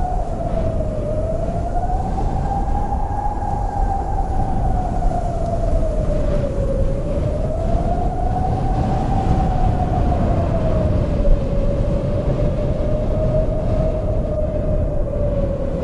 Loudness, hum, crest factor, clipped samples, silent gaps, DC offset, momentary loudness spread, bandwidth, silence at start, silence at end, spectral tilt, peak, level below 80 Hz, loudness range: -21 LUFS; none; 14 dB; under 0.1%; none; under 0.1%; 4 LU; 10.5 kHz; 0 s; 0 s; -9 dB/octave; -4 dBFS; -22 dBFS; 3 LU